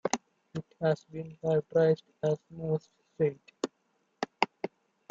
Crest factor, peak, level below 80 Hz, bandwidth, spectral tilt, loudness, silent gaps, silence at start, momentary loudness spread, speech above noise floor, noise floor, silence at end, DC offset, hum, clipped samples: 26 dB; -6 dBFS; -72 dBFS; 8 kHz; -6 dB/octave; -32 LUFS; none; 0.05 s; 15 LU; 45 dB; -75 dBFS; 0.45 s; under 0.1%; none; under 0.1%